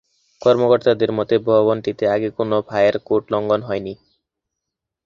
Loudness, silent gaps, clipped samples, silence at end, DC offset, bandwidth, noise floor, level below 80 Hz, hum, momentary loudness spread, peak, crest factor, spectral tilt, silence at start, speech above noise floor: -18 LUFS; none; under 0.1%; 1.1 s; under 0.1%; 7.2 kHz; -82 dBFS; -56 dBFS; none; 6 LU; -2 dBFS; 16 dB; -7.5 dB/octave; 0.4 s; 65 dB